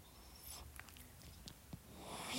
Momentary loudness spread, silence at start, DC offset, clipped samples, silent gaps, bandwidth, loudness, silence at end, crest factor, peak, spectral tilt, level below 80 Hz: 6 LU; 0 s; under 0.1%; under 0.1%; none; 16 kHz; -54 LUFS; 0 s; 24 dB; -30 dBFS; -3 dB/octave; -64 dBFS